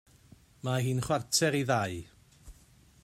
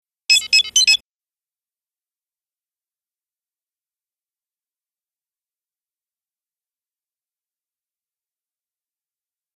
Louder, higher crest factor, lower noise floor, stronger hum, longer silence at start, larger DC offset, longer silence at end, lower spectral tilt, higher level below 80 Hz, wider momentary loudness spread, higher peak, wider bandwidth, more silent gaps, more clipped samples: second, -30 LUFS vs -13 LUFS; about the same, 20 dB vs 24 dB; second, -60 dBFS vs under -90 dBFS; neither; first, 0.65 s vs 0.3 s; neither; second, 0.5 s vs 8.6 s; first, -4 dB/octave vs 5 dB/octave; first, -60 dBFS vs -70 dBFS; first, 11 LU vs 3 LU; second, -14 dBFS vs -2 dBFS; about the same, 15.5 kHz vs 14.5 kHz; neither; neither